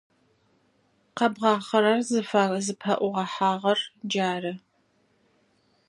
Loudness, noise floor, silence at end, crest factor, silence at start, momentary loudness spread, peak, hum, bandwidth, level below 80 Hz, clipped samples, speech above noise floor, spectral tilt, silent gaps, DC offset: -25 LUFS; -67 dBFS; 1.3 s; 20 dB; 1.15 s; 8 LU; -8 dBFS; none; 11.5 kHz; -78 dBFS; under 0.1%; 43 dB; -4.5 dB/octave; none; under 0.1%